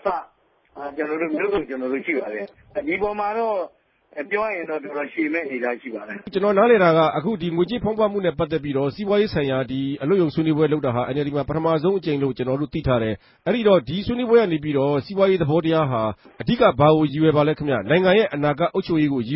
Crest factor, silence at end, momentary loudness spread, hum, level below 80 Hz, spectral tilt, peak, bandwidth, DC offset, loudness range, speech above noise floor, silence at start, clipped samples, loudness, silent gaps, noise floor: 18 dB; 0 s; 11 LU; none; -48 dBFS; -11.5 dB/octave; -4 dBFS; 5.8 kHz; under 0.1%; 7 LU; 38 dB; 0.05 s; under 0.1%; -21 LUFS; none; -59 dBFS